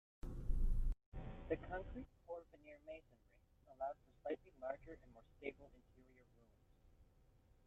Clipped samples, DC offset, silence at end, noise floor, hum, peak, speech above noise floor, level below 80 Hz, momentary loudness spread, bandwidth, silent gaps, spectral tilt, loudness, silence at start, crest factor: under 0.1%; under 0.1%; 0.65 s; -71 dBFS; none; -26 dBFS; 21 dB; -48 dBFS; 16 LU; 3.8 kHz; 1.06-1.12 s; -8.5 dB/octave; -50 LUFS; 0.25 s; 20 dB